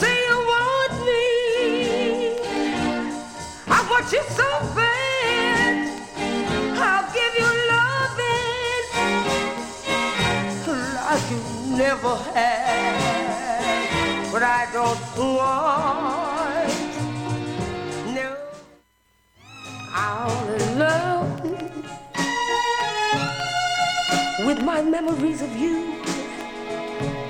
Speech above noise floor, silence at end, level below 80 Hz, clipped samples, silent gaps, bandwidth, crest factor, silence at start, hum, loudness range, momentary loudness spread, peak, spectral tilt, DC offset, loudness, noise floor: 41 dB; 0 s; -48 dBFS; under 0.1%; none; 16.5 kHz; 16 dB; 0 s; none; 5 LU; 10 LU; -6 dBFS; -4 dB/octave; under 0.1%; -22 LUFS; -63 dBFS